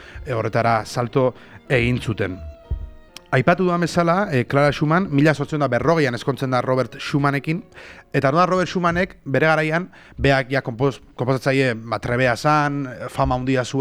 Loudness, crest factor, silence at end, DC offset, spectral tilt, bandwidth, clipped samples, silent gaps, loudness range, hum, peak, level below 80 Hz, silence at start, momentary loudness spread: -20 LUFS; 18 dB; 0 s; under 0.1%; -6.5 dB/octave; 14 kHz; under 0.1%; none; 3 LU; none; -2 dBFS; -40 dBFS; 0 s; 10 LU